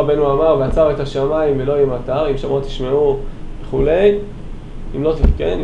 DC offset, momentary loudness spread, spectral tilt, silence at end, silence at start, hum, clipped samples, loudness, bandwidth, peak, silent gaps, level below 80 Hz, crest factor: under 0.1%; 17 LU; -8 dB/octave; 0 s; 0 s; none; under 0.1%; -17 LUFS; 8.2 kHz; 0 dBFS; none; -24 dBFS; 16 dB